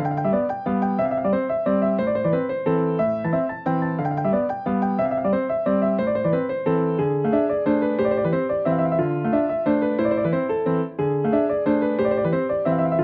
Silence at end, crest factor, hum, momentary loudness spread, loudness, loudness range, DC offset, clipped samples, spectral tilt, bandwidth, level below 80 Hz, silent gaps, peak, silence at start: 0 s; 14 dB; none; 3 LU; -22 LUFS; 1 LU; under 0.1%; under 0.1%; -11 dB/octave; 5 kHz; -54 dBFS; none; -8 dBFS; 0 s